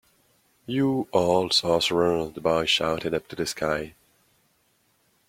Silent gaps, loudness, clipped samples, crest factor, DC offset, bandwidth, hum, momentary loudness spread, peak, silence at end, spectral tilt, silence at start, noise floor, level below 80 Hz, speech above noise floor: none; -24 LUFS; under 0.1%; 18 dB; under 0.1%; 16.5 kHz; none; 10 LU; -8 dBFS; 1.4 s; -4 dB/octave; 0.7 s; -67 dBFS; -56 dBFS; 43 dB